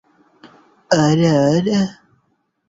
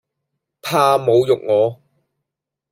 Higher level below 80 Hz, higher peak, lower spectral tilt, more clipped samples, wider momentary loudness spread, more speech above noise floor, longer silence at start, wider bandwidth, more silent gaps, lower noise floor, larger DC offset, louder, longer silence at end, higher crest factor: first, -54 dBFS vs -62 dBFS; about the same, -2 dBFS vs -2 dBFS; about the same, -6 dB/octave vs -5.5 dB/octave; neither; about the same, 6 LU vs 7 LU; second, 51 dB vs 67 dB; second, 0.45 s vs 0.65 s; second, 7.8 kHz vs 16 kHz; neither; second, -66 dBFS vs -82 dBFS; neither; about the same, -16 LUFS vs -16 LUFS; second, 0.75 s vs 0.95 s; about the same, 18 dB vs 18 dB